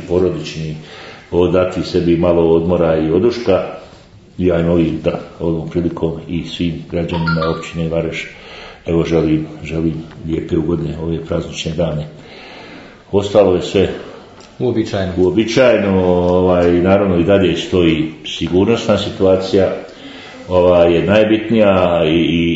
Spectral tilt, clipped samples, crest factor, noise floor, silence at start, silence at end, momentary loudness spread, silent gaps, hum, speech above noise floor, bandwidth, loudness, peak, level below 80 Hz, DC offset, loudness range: -7 dB/octave; under 0.1%; 14 dB; -41 dBFS; 0 s; 0 s; 15 LU; none; none; 27 dB; 8 kHz; -15 LUFS; 0 dBFS; -42 dBFS; under 0.1%; 6 LU